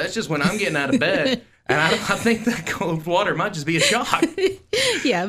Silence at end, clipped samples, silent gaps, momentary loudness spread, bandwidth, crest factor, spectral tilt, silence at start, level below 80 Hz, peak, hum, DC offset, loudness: 0 s; under 0.1%; none; 6 LU; 15.5 kHz; 20 dB; -4 dB/octave; 0 s; -52 dBFS; -2 dBFS; none; under 0.1%; -20 LUFS